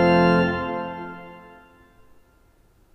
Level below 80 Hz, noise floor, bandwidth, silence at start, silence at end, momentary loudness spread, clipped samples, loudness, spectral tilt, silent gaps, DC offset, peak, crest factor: -52 dBFS; -58 dBFS; 5.8 kHz; 0 s; 1.55 s; 25 LU; under 0.1%; -22 LUFS; -8 dB/octave; none; under 0.1%; -6 dBFS; 18 dB